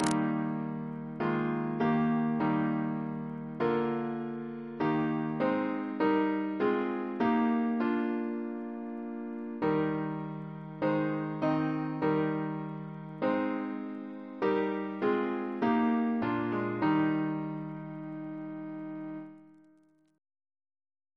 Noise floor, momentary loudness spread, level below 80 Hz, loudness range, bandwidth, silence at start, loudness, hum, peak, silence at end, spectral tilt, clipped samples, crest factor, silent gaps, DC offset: -65 dBFS; 12 LU; -70 dBFS; 4 LU; 11 kHz; 0 s; -32 LUFS; none; -12 dBFS; 1.65 s; -7.5 dB/octave; under 0.1%; 20 dB; none; under 0.1%